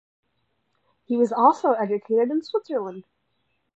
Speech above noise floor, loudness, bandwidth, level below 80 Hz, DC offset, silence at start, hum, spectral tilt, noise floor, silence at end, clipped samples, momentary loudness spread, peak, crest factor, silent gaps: 51 dB; -22 LUFS; 8 kHz; -80 dBFS; under 0.1%; 1.1 s; none; -6.5 dB/octave; -73 dBFS; 0.75 s; under 0.1%; 11 LU; -4 dBFS; 20 dB; none